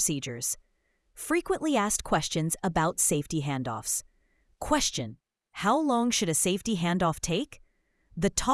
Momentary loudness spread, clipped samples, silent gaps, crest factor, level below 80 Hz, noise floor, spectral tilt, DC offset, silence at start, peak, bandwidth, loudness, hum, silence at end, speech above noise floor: 10 LU; under 0.1%; none; 20 dB; -50 dBFS; -72 dBFS; -3.5 dB/octave; under 0.1%; 0 s; -8 dBFS; 12 kHz; -28 LUFS; none; 0 s; 44 dB